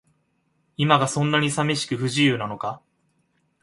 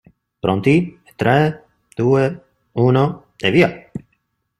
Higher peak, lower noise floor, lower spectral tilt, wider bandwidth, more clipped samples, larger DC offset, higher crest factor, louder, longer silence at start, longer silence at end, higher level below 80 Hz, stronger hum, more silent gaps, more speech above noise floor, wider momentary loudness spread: about the same, -2 dBFS vs -2 dBFS; about the same, -69 dBFS vs -68 dBFS; second, -4.5 dB/octave vs -7.5 dB/octave; about the same, 11.5 kHz vs 12.5 kHz; neither; neither; about the same, 22 dB vs 18 dB; second, -22 LUFS vs -17 LUFS; first, 0.8 s vs 0.45 s; first, 0.85 s vs 0.6 s; second, -62 dBFS vs -52 dBFS; neither; neither; second, 47 dB vs 53 dB; second, 12 LU vs 19 LU